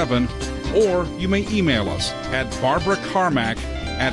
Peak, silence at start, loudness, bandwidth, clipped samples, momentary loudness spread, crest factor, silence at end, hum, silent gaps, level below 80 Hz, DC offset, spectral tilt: -8 dBFS; 0 s; -21 LUFS; 11.5 kHz; under 0.1%; 6 LU; 14 dB; 0 s; none; none; -34 dBFS; under 0.1%; -5 dB/octave